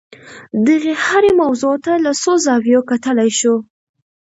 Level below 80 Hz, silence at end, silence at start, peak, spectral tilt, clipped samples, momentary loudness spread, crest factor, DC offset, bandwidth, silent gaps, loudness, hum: -56 dBFS; 0.7 s; 0.25 s; 0 dBFS; -3.5 dB/octave; under 0.1%; 5 LU; 14 dB; under 0.1%; 8 kHz; none; -14 LUFS; none